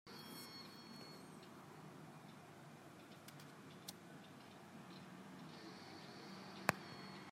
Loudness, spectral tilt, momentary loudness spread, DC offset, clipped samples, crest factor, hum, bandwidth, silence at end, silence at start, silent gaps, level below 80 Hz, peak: -53 LUFS; -4 dB/octave; 12 LU; under 0.1%; under 0.1%; 42 dB; none; 16 kHz; 0 s; 0.05 s; none; -86 dBFS; -12 dBFS